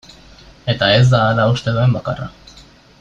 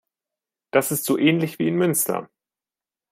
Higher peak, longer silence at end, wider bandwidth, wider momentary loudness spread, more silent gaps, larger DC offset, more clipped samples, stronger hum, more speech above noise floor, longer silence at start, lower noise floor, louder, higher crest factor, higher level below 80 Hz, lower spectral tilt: about the same, -2 dBFS vs -2 dBFS; second, 0.7 s vs 0.85 s; second, 7.6 kHz vs 16 kHz; first, 16 LU vs 5 LU; neither; neither; neither; neither; second, 30 dB vs over 69 dB; about the same, 0.65 s vs 0.75 s; second, -44 dBFS vs under -90 dBFS; first, -15 LUFS vs -21 LUFS; second, 14 dB vs 22 dB; first, -44 dBFS vs -68 dBFS; first, -6.5 dB/octave vs -4.5 dB/octave